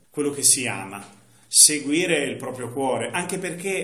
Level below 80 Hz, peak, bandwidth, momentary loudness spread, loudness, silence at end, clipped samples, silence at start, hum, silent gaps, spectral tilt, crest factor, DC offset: -72 dBFS; 0 dBFS; 15 kHz; 18 LU; -19 LUFS; 0 s; under 0.1%; 0.15 s; none; none; -1.5 dB/octave; 22 dB; 0.1%